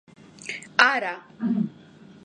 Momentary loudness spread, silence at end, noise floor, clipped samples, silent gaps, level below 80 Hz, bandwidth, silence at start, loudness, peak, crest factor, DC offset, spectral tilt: 16 LU; 0.55 s; -49 dBFS; under 0.1%; none; -74 dBFS; 10.5 kHz; 0.45 s; -23 LUFS; 0 dBFS; 26 dB; under 0.1%; -4 dB/octave